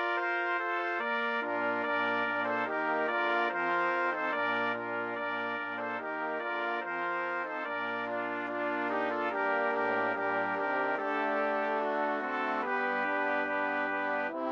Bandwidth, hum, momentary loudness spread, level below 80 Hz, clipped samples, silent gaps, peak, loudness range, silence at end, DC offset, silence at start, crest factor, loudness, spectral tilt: 7.4 kHz; none; 4 LU; -74 dBFS; under 0.1%; none; -18 dBFS; 3 LU; 0 s; under 0.1%; 0 s; 14 dB; -31 LUFS; -5.5 dB/octave